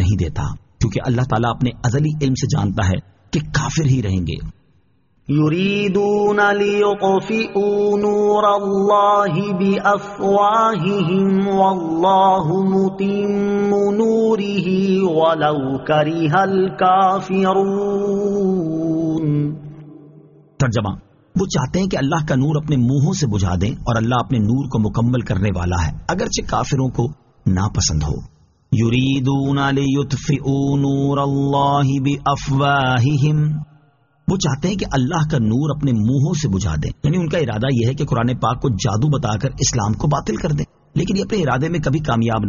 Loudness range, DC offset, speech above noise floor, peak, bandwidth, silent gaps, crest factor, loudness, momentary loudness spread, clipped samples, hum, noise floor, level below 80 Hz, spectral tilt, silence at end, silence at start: 4 LU; under 0.1%; 42 dB; -2 dBFS; 7.4 kHz; none; 14 dB; -18 LUFS; 6 LU; under 0.1%; none; -59 dBFS; -38 dBFS; -6 dB/octave; 0 s; 0 s